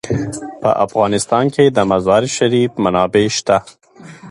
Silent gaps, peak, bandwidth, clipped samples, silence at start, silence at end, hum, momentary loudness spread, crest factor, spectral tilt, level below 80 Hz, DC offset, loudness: none; 0 dBFS; 11.5 kHz; under 0.1%; 0.05 s; 0 s; none; 6 LU; 16 dB; -5 dB/octave; -46 dBFS; under 0.1%; -15 LUFS